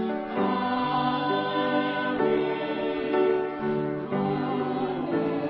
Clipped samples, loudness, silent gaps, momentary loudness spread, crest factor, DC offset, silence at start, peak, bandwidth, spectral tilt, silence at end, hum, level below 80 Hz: under 0.1%; -27 LUFS; none; 4 LU; 14 dB; under 0.1%; 0 s; -12 dBFS; 5.6 kHz; -9.5 dB/octave; 0 s; none; -62 dBFS